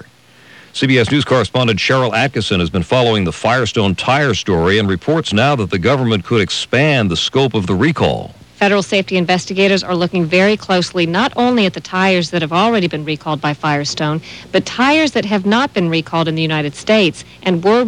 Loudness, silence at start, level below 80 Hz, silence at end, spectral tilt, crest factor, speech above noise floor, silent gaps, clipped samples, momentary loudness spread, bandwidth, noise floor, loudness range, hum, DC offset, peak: -14 LUFS; 0.75 s; -44 dBFS; 0 s; -5.5 dB/octave; 14 dB; 30 dB; none; under 0.1%; 5 LU; 10.5 kHz; -45 dBFS; 2 LU; none; 0.1%; -2 dBFS